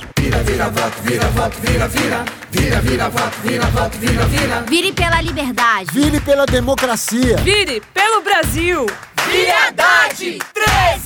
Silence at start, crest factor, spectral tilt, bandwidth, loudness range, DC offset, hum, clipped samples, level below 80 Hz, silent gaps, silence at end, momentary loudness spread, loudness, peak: 0 s; 14 dB; -4 dB/octave; over 20 kHz; 3 LU; under 0.1%; none; under 0.1%; -26 dBFS; none; 0 s; 6 LU; -15 LUFS; 0 dBFS